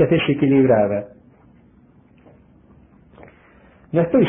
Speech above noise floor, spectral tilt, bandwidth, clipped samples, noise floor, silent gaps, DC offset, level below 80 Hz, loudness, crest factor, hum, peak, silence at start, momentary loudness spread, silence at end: 35 dB; -12 dB/octave; 3.7 kHz; under 0.1%; -52 dBFS; none; under 0.1%; -52 dBFS; -18 LUFS; 16 dB; none; -4 dBFS; 0 s; 11 LU; 0 s